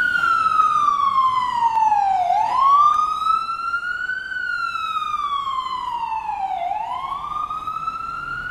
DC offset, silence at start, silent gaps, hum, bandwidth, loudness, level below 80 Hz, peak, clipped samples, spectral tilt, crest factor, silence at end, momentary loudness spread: under 0.1%; 0 s; none; none; 13.5 kHz; -20 LUFS; -52 dBFS; -6 dBFS; under 0.1%; -2.5 dB/octave; 14 dB; 0 s; 10 LU